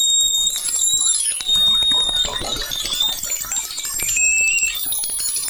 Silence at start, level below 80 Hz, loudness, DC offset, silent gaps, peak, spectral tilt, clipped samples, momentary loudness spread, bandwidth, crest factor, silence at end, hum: 0 s; -42 dBFS; -16 LUFS; under 0.1%; none; -4 dBFS; 2 dB/octave; under 0.1%; 8 LU; over 20 kHz; 14 dB; 0 s; none